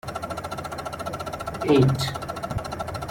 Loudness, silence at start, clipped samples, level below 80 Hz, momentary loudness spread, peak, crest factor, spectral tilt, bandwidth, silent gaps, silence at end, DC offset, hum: -26 LUFS; 0.05 s; under 0.1%; -46 dBFS; 13 LU; -8 dBFS; 18 dB; -6 dB/octave; 16.5 kHz; none; 0 s; under 0.1%; none